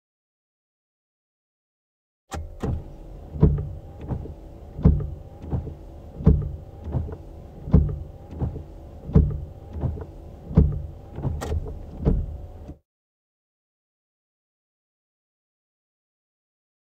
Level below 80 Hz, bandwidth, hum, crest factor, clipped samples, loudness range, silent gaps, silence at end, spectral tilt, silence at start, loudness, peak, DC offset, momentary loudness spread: -32 dBFS; 8.6 kHz; none; 24 dB; under 0.1%; 8 LU; none; 4.15 s; -9.5 dB/octave; 2.3 s; -26 LUFS; -2 dBFS; under 0.1%; 20 LU